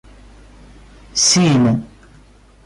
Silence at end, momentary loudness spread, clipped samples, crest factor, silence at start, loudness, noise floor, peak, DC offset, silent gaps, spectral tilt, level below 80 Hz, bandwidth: 0.8 s; 11 LU; under 0.1%; 14 dB; 1.15 s; -14 LUFS; -46 dBFS; -4 dBFS; under 0.1%; none; -4 dB/octave; -44 dBFS; 11.5 kHz